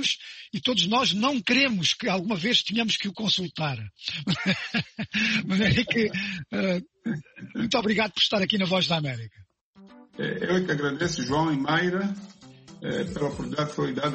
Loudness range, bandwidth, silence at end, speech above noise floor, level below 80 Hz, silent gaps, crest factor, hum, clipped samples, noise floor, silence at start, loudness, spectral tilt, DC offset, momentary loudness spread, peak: 4 LU; 8.4 kHz; 0 s; 27 dB; -54 dBFS; 9.61-9.73 s; 20 dB; none; under 0.1%; -53 dBFS; 0 s; -25 LUFS; -4.5 dB/octave; under 0.1%; 11 LU; -8 dBFS